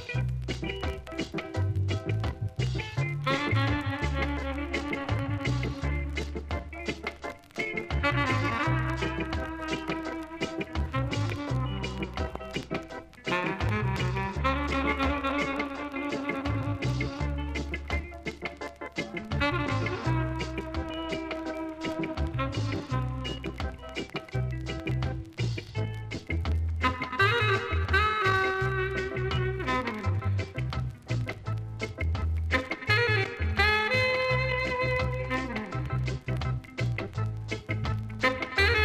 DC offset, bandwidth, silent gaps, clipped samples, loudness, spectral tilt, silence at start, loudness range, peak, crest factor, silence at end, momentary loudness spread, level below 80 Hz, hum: under 0.1%; 13.5 kHz; none; under 0.1%; -30 LUFS; -6 dB/octave; 0 s; 6 LU; -12 dBFS; 18 dB; 0 s; 10 LU; -40 dBFS; none